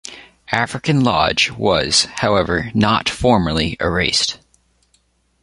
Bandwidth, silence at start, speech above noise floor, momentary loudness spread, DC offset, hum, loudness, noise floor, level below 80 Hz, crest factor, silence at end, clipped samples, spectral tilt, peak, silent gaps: 11.5 kHz; 0.05 s; 44 dB; 5 LU; under 0.1%; none; -16 LUFS; -61 dBFS; -38 dBFS; 18 dB; 1.05 s; under 0.1%; -4 dB/octave; 0 dBFS; none